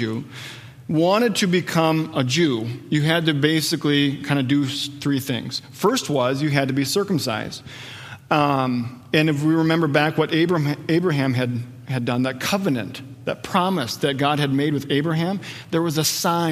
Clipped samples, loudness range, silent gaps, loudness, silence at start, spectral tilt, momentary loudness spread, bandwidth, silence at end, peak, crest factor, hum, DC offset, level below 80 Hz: under 0.1%; 3 LU; none; -21 LUFS; 0 s; -5 dB/octave; 11 LU; 15.5 kHz; 0 s; -2 dBFS; 20 dB; none; under 0.1%; -62 dBFS